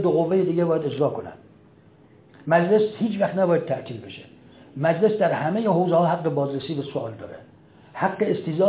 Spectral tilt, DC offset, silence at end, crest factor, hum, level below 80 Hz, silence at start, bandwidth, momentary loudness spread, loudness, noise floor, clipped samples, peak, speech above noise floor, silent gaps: -11.5 dB/octave; under 0.1%; 0 s; 18 dB; none; -64 dBFS; 0 s; 4 kHz; 18 LU; -23 LUFS; -52 dBFS; under 0.1%; -6 dBFS; 30 dB; none